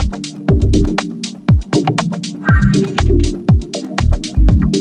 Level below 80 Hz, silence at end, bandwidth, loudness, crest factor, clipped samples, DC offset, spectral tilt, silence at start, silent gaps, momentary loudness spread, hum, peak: -18 dBFS; 0 s; 10.5 kHz; -15 LUFS; 12 dB; under 0.1%; under 0.1%; -6.5 dB/octave; 0 s; none; 8 LU; none; 0 dBFS